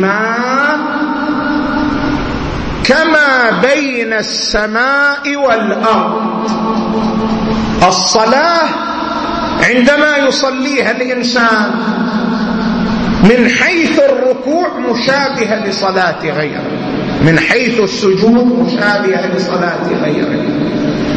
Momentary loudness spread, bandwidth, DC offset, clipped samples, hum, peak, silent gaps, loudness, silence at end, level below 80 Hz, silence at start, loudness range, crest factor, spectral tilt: 7 LU; 8.6 kHz; under 0.1%; under 0.1%; none; 0 dBFS; none; -12 LUFS; 0 s; -34 dBFS; 0 s; 2 LU; 12 dB; -4.5 dB/octave